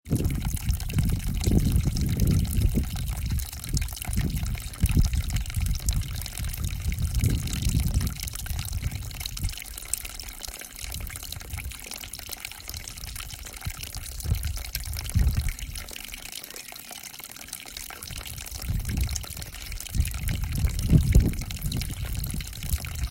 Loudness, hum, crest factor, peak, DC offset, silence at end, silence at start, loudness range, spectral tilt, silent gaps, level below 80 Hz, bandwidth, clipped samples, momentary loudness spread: -30 LUFS; none; 24 dB; -4 dBFS; under 0.1%; 0 s; 0.05 s; 8 LU; -4.5 dB/octave; none; -30 dBFS; 16.5 kHz; under 0.1%; 12 LU